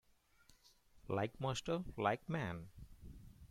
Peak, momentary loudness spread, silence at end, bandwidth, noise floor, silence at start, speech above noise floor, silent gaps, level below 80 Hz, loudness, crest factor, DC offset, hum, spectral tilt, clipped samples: -22 dBFS; 20 LU; 0.05 s; 16 kHz; -70 dBFS; 0.95 s; 30 dB; none; -62 dBFS; -41 LUFS; 22 dB; under 0.1%; none; -5.5 dB/octave; under 0.1%